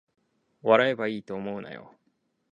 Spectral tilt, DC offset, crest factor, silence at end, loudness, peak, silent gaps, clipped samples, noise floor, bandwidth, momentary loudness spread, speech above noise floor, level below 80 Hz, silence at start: -6.5 dB/octave; under 0.1%; 26 dB; 0.7 s; -26 LUFS; -4 dBFS; none; under 0.1%; -73 dBFS; 7.4 kHz; 19 LU; 47 dB; -74 dBFS; 0.65 s